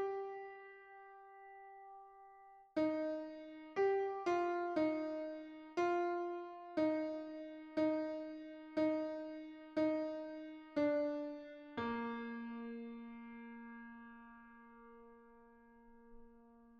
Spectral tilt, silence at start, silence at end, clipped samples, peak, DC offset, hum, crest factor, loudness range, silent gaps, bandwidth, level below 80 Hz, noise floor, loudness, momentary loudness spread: -6 dB/octave; 0 s; 0 s; under 0.1%; -26 dBFS; under 0.1%; none; 16 dB; 13 LU; none; 7.2 kHz; -76 dBFS; -64 dBFS; -41 LUFS; 21 LU